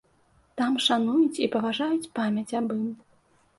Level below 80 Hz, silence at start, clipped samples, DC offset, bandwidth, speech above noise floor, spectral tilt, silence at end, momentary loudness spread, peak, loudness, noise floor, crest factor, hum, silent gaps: -70 dBFS; 0.55 s; under 0.1%; under 0.1%; 11.5 kHz; 38 dB; -4.5 dB/octave; 0.65 s; 10 LU; -10 dBFS; -26 LUFS; -63 dBFS; 16 dB; none; none